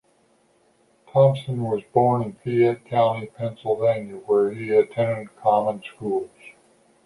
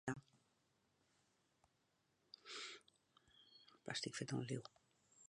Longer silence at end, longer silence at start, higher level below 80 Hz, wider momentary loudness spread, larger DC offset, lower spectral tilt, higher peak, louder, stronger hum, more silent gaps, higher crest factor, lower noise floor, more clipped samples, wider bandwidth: first, 0.55 s vs 0 s; first, 1.15 s vs 0.05 s; first, -64 dBFS vs -86 dBFS; second, 10 LU vs 20 LU; neither; first, -8.5 dB/octave vs -4 dB/octave; first, -6 dBFS vs -30 dBFS; first, -22 LUFS vs -49 LUFS; neither; neither; second, 18 dB vs 24 dB; second, -62 dBFS vs -83 dBFS; neither; about the same, 11.5 kHz vs 11 kHz